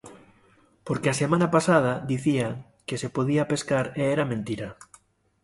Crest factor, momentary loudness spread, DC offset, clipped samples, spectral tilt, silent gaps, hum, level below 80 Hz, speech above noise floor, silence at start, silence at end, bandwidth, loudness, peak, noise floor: 20 dB; 13 LU; under 0.1%; under 0.1%; -6 dB/octave; none; none; -58 dBFS; 36 dB; 0.05 s; 0.6 s; 11.5 kHz; -25 LUFS; -6 dBFS; -60 dBFS